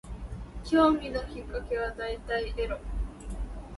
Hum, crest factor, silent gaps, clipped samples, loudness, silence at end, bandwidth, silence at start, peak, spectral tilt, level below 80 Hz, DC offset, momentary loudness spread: none; 18 dB; none; under 0.1%; -30 LUFS; 0 s; 11.5 kHz; 0.05 s; -12 dBFS; -6.5 dB/octave; -38 dBFS; under 0.1%; 18 LU